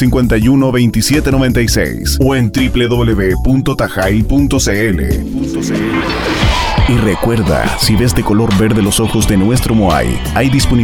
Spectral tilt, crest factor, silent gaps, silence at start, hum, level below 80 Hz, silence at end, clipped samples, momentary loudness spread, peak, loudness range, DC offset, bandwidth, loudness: -5.5 dB/octave; 10 dB; none; 0 s; none; -20 dBFS; 0 s; under 0.1%; 4 LU; 0 dBFS; 2 LU; 0.7%; 18 kHz; -12 LUFS